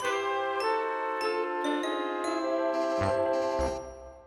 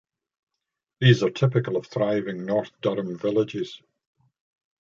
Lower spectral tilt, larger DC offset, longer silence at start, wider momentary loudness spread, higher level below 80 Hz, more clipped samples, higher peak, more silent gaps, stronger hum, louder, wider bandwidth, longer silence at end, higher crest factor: second, -5 dB/octave vs -7 dB/octave; neither; second, 0 s vs 1 s; second, 3 LU vs 9 LU; first, -50 dBFS vs -64 dBFS; neither; second, -16 dBFS vs -4 dBFS; neither; neither; second, -30 LUFS vs -24 LUFS; first, 14 kHz vs 7.4 kHz; second, 0 s vs 1.05 s; second, 14 dB vs 22 dB